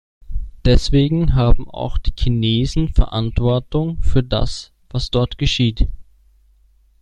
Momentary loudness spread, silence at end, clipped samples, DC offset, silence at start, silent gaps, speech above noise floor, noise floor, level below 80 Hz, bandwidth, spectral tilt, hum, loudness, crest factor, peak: 10 LU; 1 s; under 0.1%; under 0.1%; 0.3 s; none; 38 dB; -54 dBFS; -22 dBFS; 9.4 kHz; -6.5 dB/octave; none; -19 LUFS; 16 dB; -2 dBFS